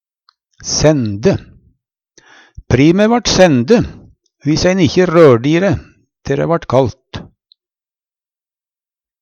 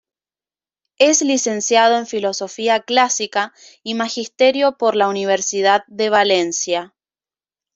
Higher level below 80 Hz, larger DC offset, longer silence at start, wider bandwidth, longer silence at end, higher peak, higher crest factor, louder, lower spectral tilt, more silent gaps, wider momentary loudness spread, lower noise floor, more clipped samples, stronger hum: first, -38 dBFS vs -68 dBFS; neither; second, 0.6 s vs 1 s; about the same, 8.8 kHz vs 8.2 kHz; first, 2 s vs 0.9 s; about the same, 0 dBFS vs -2 dBFS; about the same, 14 dB vs 16 dB; first, -12 LUFS vs -17 LUFS; first, -5.5 dB/octave vs -2 dB/octave; neither; first, 16 LU vs 9 LU; about the same, under -90 dBFS vs under -90 dBFS; neither; neither